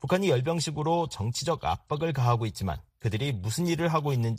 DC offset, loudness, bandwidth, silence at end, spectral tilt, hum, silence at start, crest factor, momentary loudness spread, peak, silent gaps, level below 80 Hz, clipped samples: under 0.1%; -28 LUFS; 15.5 kHz; 0 s; -5.5 dB/octave; none; 0 s; 18 dB; 6 LU; -10 dBFS; none; -50 dBFS; under 0.1%